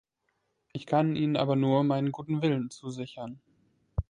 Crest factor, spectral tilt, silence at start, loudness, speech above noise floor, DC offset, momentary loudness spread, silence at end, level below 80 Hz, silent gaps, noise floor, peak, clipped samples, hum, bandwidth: 18 dB; -7.5 dB/octave; 0.75 s; -29 LUFS; 50 dB; under 0.1%; 17 LU; 0.05 s; -48 dBFS; none; -78 dBFS; -12 dBFS; under 0.1%; none; 10.5 kHz